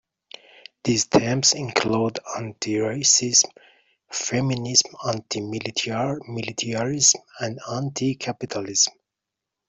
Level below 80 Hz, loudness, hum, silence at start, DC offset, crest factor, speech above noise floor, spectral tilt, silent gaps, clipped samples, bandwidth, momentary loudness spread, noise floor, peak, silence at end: -60 dBFS; -22 LUFS; none; 0.85 s; under 0.1%; 22 dB; 62 dB; -2.5 dB/octave; none; under 0.1%; 8.2 kHz; 12 LU; -85 dBFS; -2 dBFS; 0.8 s